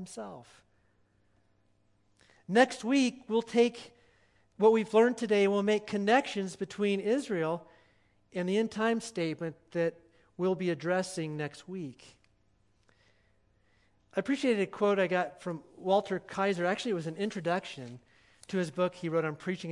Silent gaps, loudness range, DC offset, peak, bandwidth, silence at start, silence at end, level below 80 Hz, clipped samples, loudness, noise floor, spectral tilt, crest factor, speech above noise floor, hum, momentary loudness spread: none; 8 LU; under 0.1%; -10 dBFS; 11.5 kHz; 0 s; 0 s; -76 dBFS; under 0.1%; -30 LUFS; -69 dBFS; -5.5 dB/octave; 22 dB; 39 dB; 60 Hz at -60 dBFS; 14 LU